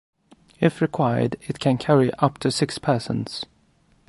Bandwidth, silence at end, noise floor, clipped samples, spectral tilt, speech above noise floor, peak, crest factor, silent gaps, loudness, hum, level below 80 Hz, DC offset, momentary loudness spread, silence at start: 11.5 kHz; 0.65 s; -60 dBFS; under 0.1%; -6 dB/octave; 39 dB; -4 dBFS; 20 dB; none; -22 LUFS; none; -56 dBFS; under 0.1%; 9 LU; 0.6 s